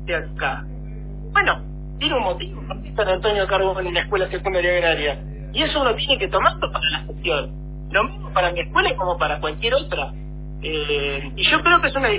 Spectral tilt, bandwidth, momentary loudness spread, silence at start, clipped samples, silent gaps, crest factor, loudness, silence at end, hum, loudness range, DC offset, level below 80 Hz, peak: -8 dB/octave; 4 kHz; 14 LU; 0 s; under 0.1%; none; 18 dB; -20 LUFS; 0 s; none; 2 LU; under 0.1%; -34 dBFS; -4 dBFS